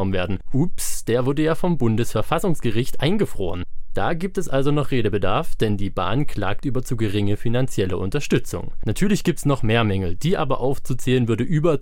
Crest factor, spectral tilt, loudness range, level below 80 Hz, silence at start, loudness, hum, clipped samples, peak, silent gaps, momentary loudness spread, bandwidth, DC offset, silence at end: 12 dB; -6 dB/octave; 2 LU; -32 dBFS; 0 s; -23 LUFS; none; under 0.1%; -6 dBFS; none; 6 LU; 16.5 kHz; under 0.1%; 0 s